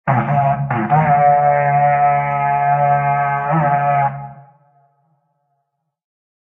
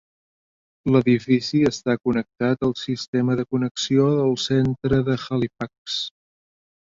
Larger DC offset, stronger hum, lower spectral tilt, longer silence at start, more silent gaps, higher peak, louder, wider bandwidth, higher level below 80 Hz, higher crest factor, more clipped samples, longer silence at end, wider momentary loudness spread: neither; neither; first, -10.5 dB/octave vs -6 dB/octave; second, 0.05 s vs 0.85 s; second, none vs 3.08-3.13 s, 3.71-3.75 s, 5.78-5.85 s; about the same, -2 dBFS vs -4 dBFS; first, -15 LUFS vs -22 LUFS; second, 3.3 kHz vs 7.8 kHz; about the same, -50 dBFS vs -52 dBFS; about the same, 14 dB vs 18 dB; neither; first, 2.05 s vs 0.75 s; second, 5 LU vs 9 LU